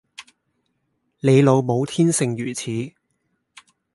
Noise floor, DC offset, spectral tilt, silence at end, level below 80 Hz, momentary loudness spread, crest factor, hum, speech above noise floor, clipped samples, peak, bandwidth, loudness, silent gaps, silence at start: -72 dBFS; under 0.1%; -6 dB/octave; 1.05 s; -64 dBFS; 13 LU; 20 dB; none; 53 dB; under 0.1%; -2 dBFS; 11.5 kHz; -19 LUFS; none; 0.2 s